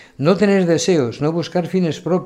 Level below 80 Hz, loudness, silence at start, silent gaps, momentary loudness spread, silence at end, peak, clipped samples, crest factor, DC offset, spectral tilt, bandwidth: -56 dBFS; -17 LUFS; 0.2 s; none; 6 LU; 0 s; -2 dBFS; under 0.1%; 16 dB; under 0.1%; -6 dB/octave; 11.5 kHz